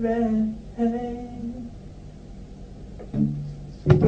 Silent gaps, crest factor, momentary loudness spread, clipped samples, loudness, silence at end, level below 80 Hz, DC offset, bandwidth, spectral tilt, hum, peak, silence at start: none; 24 dB; 20 LU; under 0.1%; -27 LUFS; 0 s; -42 dBFS; under 0.1%; 7.6 kHz; -9.5 dB/octave; 50 Hz at -45 dBFS; -2 dBFS; 0 s